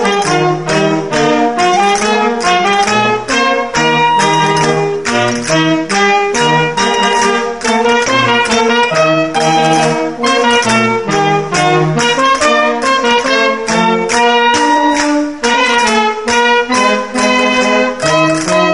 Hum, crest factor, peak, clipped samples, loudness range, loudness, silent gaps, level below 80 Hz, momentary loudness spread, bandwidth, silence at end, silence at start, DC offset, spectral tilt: none; 12 dB; 0 dBFS; under 0.1%; 1 LU; -11 LUFS; none; -46 dBFS; 3 LU; 11.5 kHz; 0 s; 0 s; 0.8%; -3.5 dB/octave